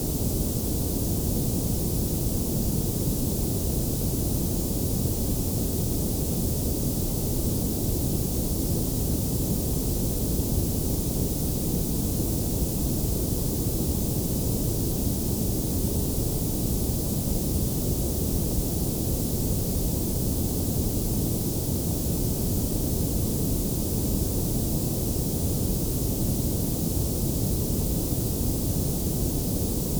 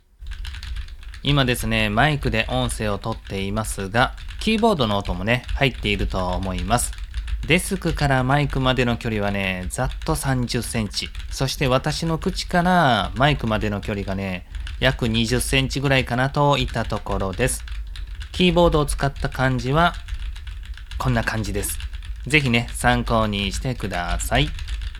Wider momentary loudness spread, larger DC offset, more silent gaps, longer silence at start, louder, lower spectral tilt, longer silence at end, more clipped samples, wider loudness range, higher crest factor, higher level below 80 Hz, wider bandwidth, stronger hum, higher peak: second, 1 LU vs 14 LU; neither; neither; second, 0 s vs 0.2 s; second, -26 LUFS vs -22 LUFS; about the same, -5.5 dB/octave vs -5 dB/octave; about the same, 0 s vs 0 s; neither; about the same, 0 LU vs 2 LU; second, 14 dB vs 22 dB; about the same, -32 dBFS vs -30 dBFS; first, over 20 kHz vs 16 kHz; neither; second, -12 dBFS vs 0 dBFS